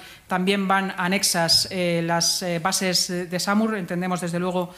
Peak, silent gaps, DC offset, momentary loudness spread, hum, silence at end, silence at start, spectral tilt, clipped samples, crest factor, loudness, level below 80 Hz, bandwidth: -6 dBFS; none; under 0.1%; 7 LU; none; 0 s; 0 s; -3 dB/octave; under 0.1%; 16 dB; -22 LUFS; -60 dBFS; 16 kHz